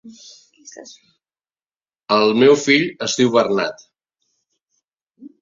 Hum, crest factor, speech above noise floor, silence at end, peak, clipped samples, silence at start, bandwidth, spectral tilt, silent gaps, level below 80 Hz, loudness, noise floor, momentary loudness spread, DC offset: none; 18 dB; over 73 dB; 0.15 s; -2 dBFS; under 0.1%; 0.05 s; 7.6 kHz; -4 dB/octave; none; -66 dBFS; -16 LUFS; under -90 dBFS; 24 LU; under 0.1%